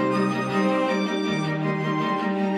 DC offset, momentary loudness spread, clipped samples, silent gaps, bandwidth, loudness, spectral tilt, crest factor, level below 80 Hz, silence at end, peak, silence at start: under 0.1%; 3 LU; under 0.1%; none; 11 kHz; -24 LUFS; -6.5 dB/octave; 12 dB; -68 dBFS; 0 s; -10 dBFS; 0 s